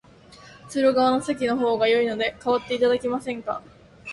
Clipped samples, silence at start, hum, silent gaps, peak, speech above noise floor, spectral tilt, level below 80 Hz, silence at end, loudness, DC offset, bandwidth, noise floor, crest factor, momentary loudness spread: under 0.1%; 0.3 s; none; none; -10 dBFS; 26 dB; -4.5 dB/octave; -58 dBFS; 0 s; -23 LUFS; under 0.1%; 11.5 kHz; -48 dBFS; 14 dB; 11 LU